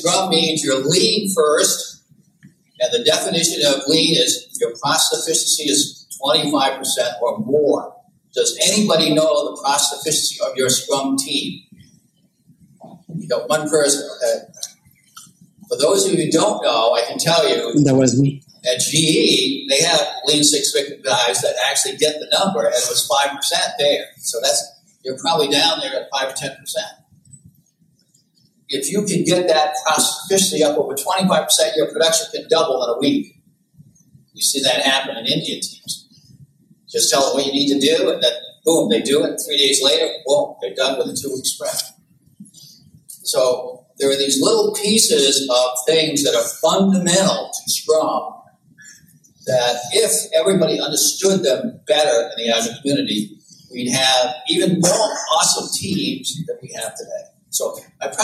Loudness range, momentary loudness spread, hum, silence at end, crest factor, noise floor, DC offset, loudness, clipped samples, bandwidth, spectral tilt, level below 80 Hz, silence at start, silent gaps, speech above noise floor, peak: 6 LU; 11 LU; none; 0 s; 18 dB; -60 dBFS; under 0.1%; -17 LUFS; under 0.1%; 15 kHz; -2.5 dB/octave; -66 dBFS; 0 s; none; 42 dB; -2 dBFS